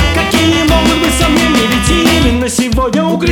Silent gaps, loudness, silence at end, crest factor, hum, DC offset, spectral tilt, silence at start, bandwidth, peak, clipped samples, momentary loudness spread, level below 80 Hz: none; -10 LUFS; 0 s; 10 dB; none; under 0.1%; -4.5 dB/octave; 0 s; 19.5 kHz; 0 dBFS; under 0.1%; 3 LU; -20 dBFS